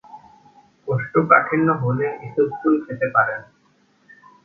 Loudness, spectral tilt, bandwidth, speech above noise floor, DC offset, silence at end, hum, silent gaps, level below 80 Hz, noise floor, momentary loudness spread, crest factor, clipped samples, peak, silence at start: -19 LUFS; -11 dB/octave; 3.8 kHz; 41 dB; under 0.1%; 1.05 s; none; none; -62 dBFS; -60 dBFS; 11 LU; 22 dB; under 0.1%; 0 dBFS; 0.1 s